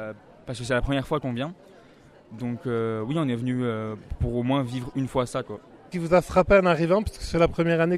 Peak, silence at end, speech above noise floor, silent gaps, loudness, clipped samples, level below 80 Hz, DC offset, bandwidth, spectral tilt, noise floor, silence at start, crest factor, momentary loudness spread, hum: -6 dBFS; 0 s; 28 dB; none; -25 LUFS; under 0.1%; -40 dBFS; under 0.1%; 13 kHz; -7 dB/octave; -52 dBFS; 0 s; 20 dB; 15 LU; none